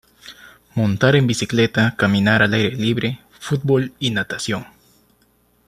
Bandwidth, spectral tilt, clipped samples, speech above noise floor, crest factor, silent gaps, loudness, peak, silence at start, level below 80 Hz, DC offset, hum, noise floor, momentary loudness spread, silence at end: 13 kHz; -5.5 dB/octave; under 0.1%; 42 dB; 18 dB; none; -18 LUFS; -2 dBFS; 0.25 s; -52 dBFS; under 0.1%; none; -59 dBFS; 12 LU; 1.05 s